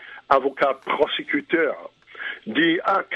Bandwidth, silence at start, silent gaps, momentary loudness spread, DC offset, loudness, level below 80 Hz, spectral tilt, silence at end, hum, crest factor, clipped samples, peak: 7 kHz; 0 s; none; 14 LU; under 0.1%; -22 LUFS; -62 dBFS; -6 dB/octave; 0 s; none; 22 dB; under 0.1%; 0 dBFS